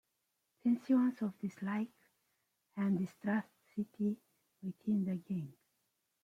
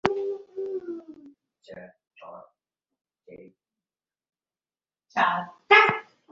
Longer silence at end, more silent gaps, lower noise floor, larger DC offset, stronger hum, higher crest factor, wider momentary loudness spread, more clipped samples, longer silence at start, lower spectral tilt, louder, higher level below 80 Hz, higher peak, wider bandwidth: first, 0.75 s vs 0.3 s; neither; second, -84 dBFS vs under -90 dBFS; neither; neither; second, 16 dB vs 26 dB; second, 15 LU vs 29 LU; neither; first, 0.65 s vs 0.05 s; first, -8.5 dB/octave vs -4.5 dB/octave; second, -37 LUFS vs -23 LUFS; second, -82 dBFS vs -66 dBFS; second, -22 dBFS vs -2 dBFS; about the same, 7.8 kHz vs 7.6 kHz